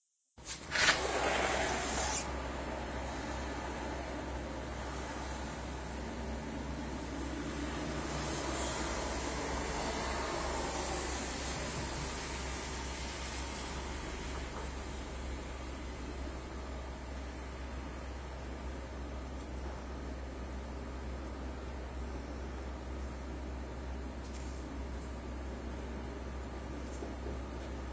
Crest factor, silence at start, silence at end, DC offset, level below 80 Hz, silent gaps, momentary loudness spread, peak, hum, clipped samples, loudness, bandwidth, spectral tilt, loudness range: 24 dB; 0.35 s; 0 s; under 0.1%; -44 dBFS; none; 10 LU; -14 dBFS; none; under 0.1%; -39 LUFS; 8 kHz; -4 dB/octave; 8 LU